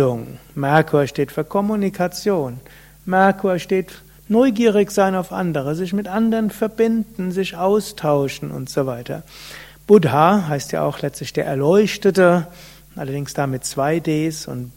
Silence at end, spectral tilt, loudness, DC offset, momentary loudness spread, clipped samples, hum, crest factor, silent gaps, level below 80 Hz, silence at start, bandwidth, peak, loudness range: 0.05 s; -6 dB/octave; -19 LUFS; under 0.1%; 14 LU; under 0.1%; none; 18 dB; none; -50 dBFS; 0 s; 16.5 kHz; 0 dBFS; 4 LU